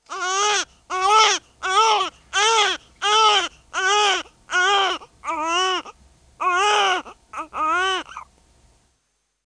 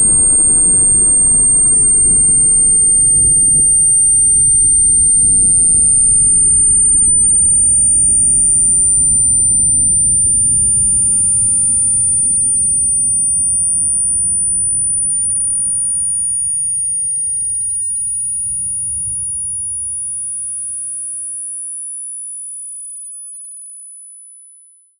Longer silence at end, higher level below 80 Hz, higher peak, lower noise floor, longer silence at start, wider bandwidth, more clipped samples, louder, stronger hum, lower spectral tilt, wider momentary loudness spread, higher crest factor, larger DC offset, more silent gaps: first, 1.25 s vs 0.75 s; second, -58 dBFS vs -34 dBFS; about the same, -4 dBFS vs -4 dBFS; first, -71 dBFS vs -46 dBFS; about the same, 0.1 s vs 0 s; about the same, 10.5 kHz vs 10.5 kHz; neither; second, -19 LUFS vs -9 LUFS; neither; second, 1 dB/octave vs -4.5 dB/octave; about the same, 12 LU vs 14 LU; first, 18 dB vs 8 dB; neither; neither